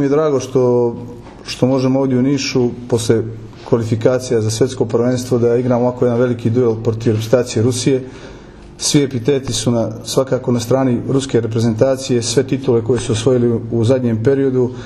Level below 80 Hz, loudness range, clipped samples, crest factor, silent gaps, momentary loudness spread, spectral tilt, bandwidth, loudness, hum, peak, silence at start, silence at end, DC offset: -44 dBFS; 2 LU; under 0.1%; 16 dB; none; 5 LU; -6 dB/octave; 13 kHz; -16 LUFS; none; 0 dBFS; 0 s; 0 s; under 0.1%